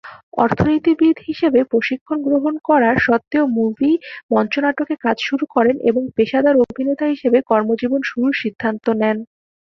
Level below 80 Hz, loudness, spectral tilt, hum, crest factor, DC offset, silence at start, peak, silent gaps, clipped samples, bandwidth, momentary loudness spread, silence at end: -50 dBFS; -17 LUFS; -7 dB/octave; none; 16 dB; under 0.1%; 0.05 s; -2 dBFS; 0.23-0.32 s, 2.01-2.06 s, 4.23-4.29 s; under 0.1%; 6.4 kHz; 6 LU; 0.45 s